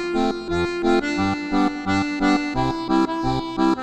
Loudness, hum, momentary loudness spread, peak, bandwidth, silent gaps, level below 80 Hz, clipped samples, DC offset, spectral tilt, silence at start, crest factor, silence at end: -22 LUFS; none; 4 LU; -6 dBFS; 9.4 kHz; none; -40 dBFS; under 0.1%; under 0.1%; -6 dB/octave; 0 s; 14 dB; 0 s